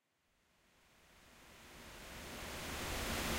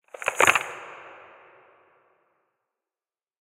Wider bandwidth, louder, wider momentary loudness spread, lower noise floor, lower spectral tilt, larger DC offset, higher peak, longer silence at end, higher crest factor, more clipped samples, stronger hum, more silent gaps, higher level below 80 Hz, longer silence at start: about the same, 16 kHz vs 16 kHz; second, -44 LUFS vs -22 LUFS; about the same, 23 LU vs 25 LU; second, -79 dBFS vs under -90 dBFS; first, -3 dB/octave vs -1 dB/octave; neither; second, -28 dBFS vs 0 dBFS; second, 0 s vs 2.3 s; second, 20 dB vs 30 dB; neither; neither; neither; first, -56 dBFS vs -70 dBFS; first, 0.9 s vs 0.2 s